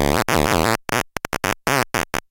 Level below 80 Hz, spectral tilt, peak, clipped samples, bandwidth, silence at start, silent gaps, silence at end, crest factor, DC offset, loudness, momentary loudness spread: -36 dBFS; -4 dB/octave; -2 dBFS; under 0.1%; 17 kHz; 0 s; none; 0.1 s; 18 dB; under 0.1%; -20 LUFS; 6 LU